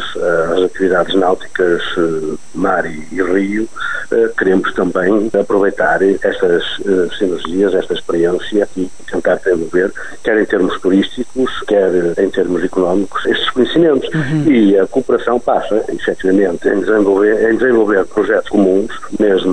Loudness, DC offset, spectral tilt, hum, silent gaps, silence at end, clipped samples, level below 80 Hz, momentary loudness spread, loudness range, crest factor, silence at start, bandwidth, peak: -14 LUFS; 4%; -6 dB/octave; none; none; 0 s; under 0.1%; -42 dBFS; 7 LU; 3 LU; 12 dB; 0 s; 10.5 kHz; -2 dBFS